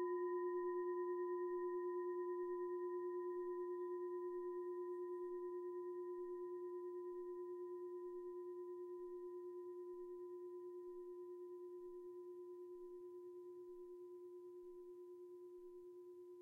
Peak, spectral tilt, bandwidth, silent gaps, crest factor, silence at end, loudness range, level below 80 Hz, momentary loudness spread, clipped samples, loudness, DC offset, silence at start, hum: -36 dBFS; -7.5 dB/octave; 2 kHz; none; 12 dB; 0 s; 11 LU; -88 dBFS; 13 LU; under 0.1%; -49 LUFS; under 0.1%; 0 s; none